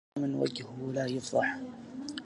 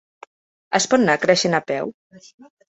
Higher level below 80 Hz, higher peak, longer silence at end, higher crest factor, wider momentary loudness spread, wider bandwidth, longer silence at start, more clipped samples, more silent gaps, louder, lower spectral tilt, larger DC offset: second, -72 dBFS vs -62 dBFS; second, -14 dBFS vs -2 dBFS; second, 0 s vs 0.5 s; about the same, 18 dB vs 20 dB; about the same, 11 LU vs 10 LU; first, 11.5 kHz vs 8.4 kHz; second, 0.15 s vs 0.7 s; neither; second, none vs 1.94-2.10 s; second, -34 LUFS vs -19 LUFS; first, -5 dB/octave vs -3.5 dB/octave; neither